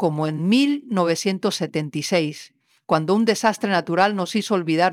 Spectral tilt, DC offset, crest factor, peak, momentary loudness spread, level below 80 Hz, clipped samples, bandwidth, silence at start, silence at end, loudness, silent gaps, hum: -5 dB/octave; under 0.1%; 18 dB; -4 dBFS; 6 LU; -72 dBFS; under 0.1%; 15.5 kHz; 0 s; 0 s; -21 LUFS; none; none